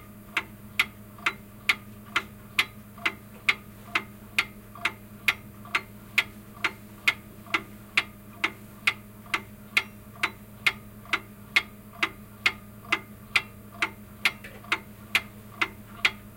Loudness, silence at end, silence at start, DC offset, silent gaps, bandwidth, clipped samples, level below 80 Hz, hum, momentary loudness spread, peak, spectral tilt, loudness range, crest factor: -29 LUFS; 0 s; 0 s; under 0.1%; none; 17 kHz; under 0.1%; -58 dBFS; none; 5 LU; -6 dBFS; -2 dB/octave; 1 LU; 26 dB